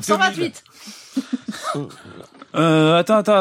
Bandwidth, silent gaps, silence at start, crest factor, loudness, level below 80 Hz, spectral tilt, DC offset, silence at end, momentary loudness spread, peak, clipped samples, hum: 16 kHz; none; 0 s; 16 dB; -19 LUFS; -68 dBFS; -5 dB/octave; under 0.1%; 0 s; 23 LU; -4 dBFS; under 0.1%; none